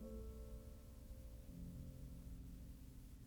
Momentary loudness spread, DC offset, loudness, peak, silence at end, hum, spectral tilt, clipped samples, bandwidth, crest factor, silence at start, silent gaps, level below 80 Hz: 5 LU; under 0.1%; -57 LUFS; -42 dBFS; 0 s; none; -7 dB/octave; under 0.1%; over 20 kHz; 12 dB; 0 s; none; -56 dBFS